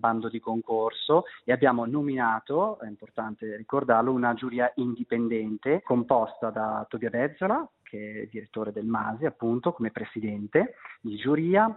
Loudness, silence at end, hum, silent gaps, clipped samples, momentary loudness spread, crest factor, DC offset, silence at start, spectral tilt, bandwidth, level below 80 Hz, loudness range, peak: -28 LUFS; 0 s; none; none; under 0.1%; 13 LU; 20 dB; under 0.1%; 0.05 s; -5 dB/octave; 4.1 kHz; -68 dBFS; 4 LU; -6 dBFS